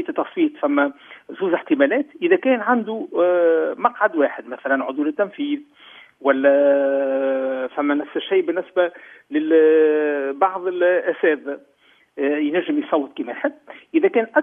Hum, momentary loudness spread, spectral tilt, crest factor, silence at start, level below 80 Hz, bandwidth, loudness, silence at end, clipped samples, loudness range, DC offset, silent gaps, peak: none; 10 LU; -8 dB/octave; 18 dB; 0 s; -78 dBFS; 3.7 kHz; -20 LUFS; 0 s; under 0.1%; 3 LU; under 0.1%; none; -2 dBFS